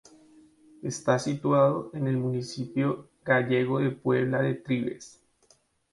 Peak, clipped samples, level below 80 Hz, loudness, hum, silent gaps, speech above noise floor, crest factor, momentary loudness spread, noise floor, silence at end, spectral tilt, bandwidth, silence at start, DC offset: -6 dBFS; under 0.1%; -68 dBFS; -27 LUFS; none; none; 38 dB; 22 dB; 11 LU; -65 dBFS; 0.85 s; -6.5 dB/octave; 11.5 kHz; 0.85 s; under 0.1%